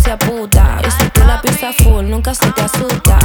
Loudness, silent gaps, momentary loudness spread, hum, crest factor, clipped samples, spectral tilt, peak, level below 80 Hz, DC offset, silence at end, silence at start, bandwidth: -12 LUFS; none; 4 LU; none; 10 dB; under 0.1%; -4.5 dB/octave; 0 dBFS; -12 dBFS; under 0.1%; 0 s; 0 s; over 20 kHz